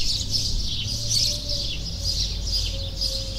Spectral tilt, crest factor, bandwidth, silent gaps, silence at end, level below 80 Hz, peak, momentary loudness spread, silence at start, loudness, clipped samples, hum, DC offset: -2 dB/octave; 16 dB; 16 kHz; none; 0 s; -32 dBFS; -8 dBFS; 6 LU; 0 s; -24 LUFS; under 0.1%; none; under 0.1%